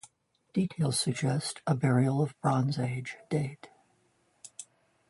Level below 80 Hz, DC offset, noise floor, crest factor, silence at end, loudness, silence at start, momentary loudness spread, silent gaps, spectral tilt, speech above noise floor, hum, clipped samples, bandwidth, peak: -68 dBFS; under 0.1%; -70 dBFS; 18 dB; 0.45 s; -30 LUFS; 0.55 s; 20 LU; none; -5.5 dB/octave; 41 dB; none; under 0.1%; 11.5 kHz; -14 dBFS